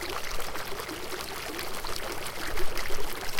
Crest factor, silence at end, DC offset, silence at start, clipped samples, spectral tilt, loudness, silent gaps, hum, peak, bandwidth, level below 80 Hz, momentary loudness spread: 18 dB; 0 s; under 0.1%; 0 s; under 0.1%; -2.5 dB/octave; -35 LUFS; none; none; -10 dBFS; 17 kHz; -38 dBFS; 2 LU